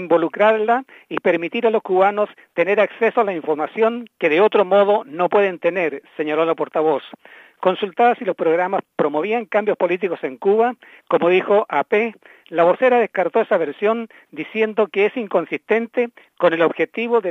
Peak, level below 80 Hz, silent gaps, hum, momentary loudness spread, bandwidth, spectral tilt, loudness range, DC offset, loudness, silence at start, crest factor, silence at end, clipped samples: -2 dBFS; -78 dBFS; none; none; 8 LU; 6.2 kHz; -7 dB/octave; 2 LU; under 0.1%; -19 LUFS; 0 s; 18 dB; 0 s; under 0.1%